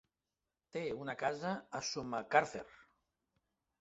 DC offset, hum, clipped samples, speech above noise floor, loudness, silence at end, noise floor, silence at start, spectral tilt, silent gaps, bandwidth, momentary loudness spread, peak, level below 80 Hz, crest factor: under 0.1%; none; under 0.1%; over 52 dB; -38 LUFS; 1 s; under -90 dBFS; 0.75 s; -3 dB/octave; none; 8 kHz; 13 LU; -14 dBFS; -76 dBFS; 26 dB